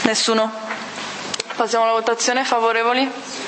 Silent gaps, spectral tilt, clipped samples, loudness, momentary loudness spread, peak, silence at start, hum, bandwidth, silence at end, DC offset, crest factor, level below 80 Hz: none; -1.5 dB/octave; under 0.1%; -19 LUFS; 11 LU; 0 dBFS; 0 s; none; 8.8 kHz; 0 s; under 0.1%; 20 dB; -68 dBFS